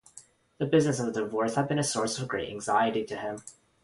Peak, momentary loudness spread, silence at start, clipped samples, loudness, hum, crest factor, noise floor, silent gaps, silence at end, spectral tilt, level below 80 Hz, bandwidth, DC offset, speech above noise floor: -12 dBFS; 10 LU; 0.15 s; under 0.1%; -29 LUFS; none; 18 dB; -55 dBFS; none; 0.35 s; -5 dB/octave; -64 dBFS; 11.5 kHz; under 0.1%; 27 dB